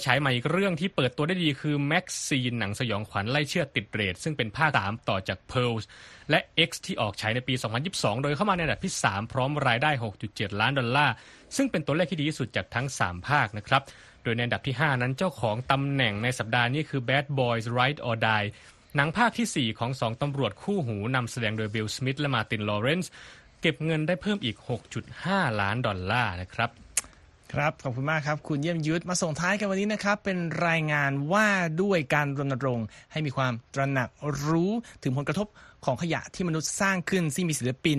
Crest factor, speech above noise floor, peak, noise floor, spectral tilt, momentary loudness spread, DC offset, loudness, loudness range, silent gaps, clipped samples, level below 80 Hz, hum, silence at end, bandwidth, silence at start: 22 dB; 25 dB; -6 dBFS; -52 dBFS; -4.5 dB/octave; 7 LU; under 0.1%; -27 LUFS; 3 LU; none; under 0.1%; -56 dBFS; none; 0 s; 13 kHz; 0 s